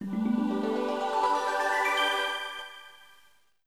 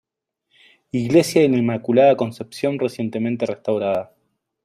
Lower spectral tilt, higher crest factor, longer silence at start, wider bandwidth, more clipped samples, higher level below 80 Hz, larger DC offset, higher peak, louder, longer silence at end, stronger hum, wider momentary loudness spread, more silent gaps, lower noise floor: second, -4 dB/octave vs -6.5 dB/octave; about the same, 14 dB vs 18 dB; second, 0 s vs 0.95 s; about the same, 15.5 kHz vs 14.5 kHz; neither; second, -74 dBFS vs -62 dBFS; first, 0.1% vs under 0.1%; second, -14 dBFS vs -2 dBFS; second, -28 LUFS vs -19 LUFS; about the same, 0.7 s vs 0.6 s; neither; about the same, 13 LU vs 11 LU; neither; second, -64 dBFS vs -76 dBFS